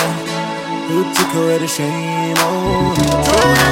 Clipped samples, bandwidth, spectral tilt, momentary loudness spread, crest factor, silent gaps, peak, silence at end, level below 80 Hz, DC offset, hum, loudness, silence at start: under 0.1%; 16.5 kHz; -4 dB/octave; 9 LU; 16 dB; none; 0 dBFS; 0 s; -36 dBFS; under 0.1%; none; -15 LUFS; 0 s